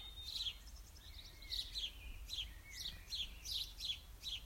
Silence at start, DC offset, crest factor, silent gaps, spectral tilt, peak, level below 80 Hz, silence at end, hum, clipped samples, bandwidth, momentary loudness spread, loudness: 0 s; under 0.1%; 18 dB; none; -1 dB/octave; -30 dBFS; -56 dBFS; 0 s; none; under 0.1%; 16 kHz; 13 LU; -45 LUFS